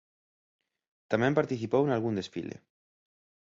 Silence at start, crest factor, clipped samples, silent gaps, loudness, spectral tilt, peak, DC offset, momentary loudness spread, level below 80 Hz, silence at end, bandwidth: 1.1 s; 22 dB; under 0.1%; none; -29 LUFS; -7 dB/octave; -10 dBFS; under 0.1%; 14 LU; -66 dBFS; 0.9 s; 7.8 kHz